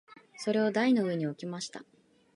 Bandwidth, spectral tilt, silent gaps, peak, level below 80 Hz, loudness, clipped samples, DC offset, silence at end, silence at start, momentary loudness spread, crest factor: 11.5 kHz; -5.5 dB/octave; none; -16 dBFS; -82 dBFS; -30 LUFS; under 0.1%; under 0.1%; 0.55 s; 0.1 s; 13 LU; 16 dB